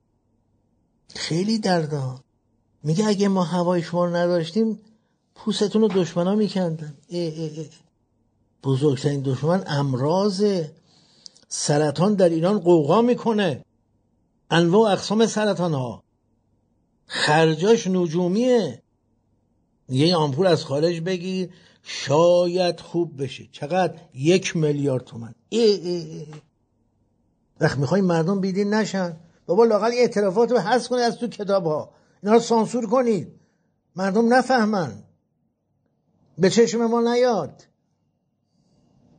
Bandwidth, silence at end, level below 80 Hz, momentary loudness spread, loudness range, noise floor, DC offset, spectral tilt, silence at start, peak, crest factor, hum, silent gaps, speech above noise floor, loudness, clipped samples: 9.4 kHz; 1.7 s; -66 dBFS; 14 LU; 4 LU; -71 dBFS; under 0.1%; -5.5 dB/octave; 1.15 s; -4 dBFS; 18 dB; none; none; 50 dB; -21 LUFS; under 0.1%